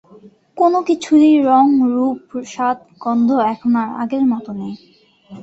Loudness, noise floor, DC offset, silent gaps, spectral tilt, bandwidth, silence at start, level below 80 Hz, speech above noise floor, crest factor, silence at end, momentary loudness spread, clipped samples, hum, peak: -16 LUFS; -45 dBFS; under 0.1%; none; -6 dB/octave; 8 kHz; 0.55 s; -62 dBFS; 30 dB; 14 dB; 0 s; 16 LU; under 0.1%; none; -2 dBFS